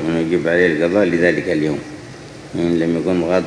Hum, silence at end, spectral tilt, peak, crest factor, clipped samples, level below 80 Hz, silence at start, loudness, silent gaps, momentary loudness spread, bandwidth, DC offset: none; 0 s; -6.5 dB/octave; 0 dBFS; 16 dB; under 0.1%; -48 dBFS; 0 s; -17 LUFS; none; 18 LU; 10.5 kHz; under 0.1%